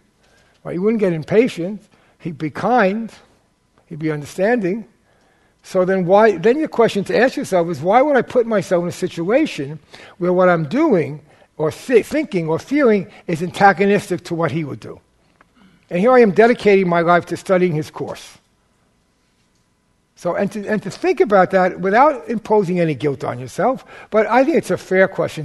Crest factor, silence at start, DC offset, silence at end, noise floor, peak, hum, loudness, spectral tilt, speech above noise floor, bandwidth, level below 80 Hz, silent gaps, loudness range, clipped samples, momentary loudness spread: 18 dB; 0.65 s; under 0.1%; 0 s; -62 dBFS; 0 dBFS; none; -17 LUFS; -6.5 dB/octave; 46 dB; 12.5 kHz; -56 dBFS; none; 6 LU; under 0.1%; 14 LU